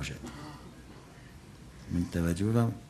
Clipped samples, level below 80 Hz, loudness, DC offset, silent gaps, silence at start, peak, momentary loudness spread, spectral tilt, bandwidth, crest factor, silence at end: under 0.1%; -50 dBFS; -32 LUFS; under 0.1%; none; 0 s; -14 dBFS; 22 LU; -7 dB/octave; 13.5 kHz; 20 dB; 0 s